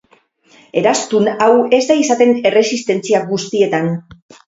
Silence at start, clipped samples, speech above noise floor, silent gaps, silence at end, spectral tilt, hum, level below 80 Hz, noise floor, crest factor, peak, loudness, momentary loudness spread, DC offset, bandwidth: 0.75 s; under 0.1%; 40 dB; none; 0.5 s; -4.5 dB/octave; none; -58 dBFS; -53 dBFS; 14 dB; 0 dBFS; -14 LUFS; 7 LU; under 0.1%; 8 kHz